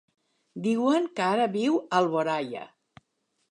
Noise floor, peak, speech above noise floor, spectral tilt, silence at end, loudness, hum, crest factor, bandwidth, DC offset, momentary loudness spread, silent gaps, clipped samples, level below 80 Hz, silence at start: -76 dBFS; -10 dBFS; 50 dB; -5.5 dB/octave; 0.85 s; -26 LUFS; none; 18 dB; 11 kHz; under 0.1%; 11 LU; none; under 0.1%; -78 dBFS; 0.55 s